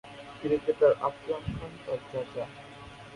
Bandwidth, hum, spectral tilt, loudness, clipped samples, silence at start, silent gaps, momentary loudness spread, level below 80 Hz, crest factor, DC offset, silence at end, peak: 11 kHz; none; -7 dB/octave; -30 LUFS; under 0.1%; 0.05 s; none; 22 LU; -56 dBFS; 20 dB; under 0.1%; 0 s; -10 dBFS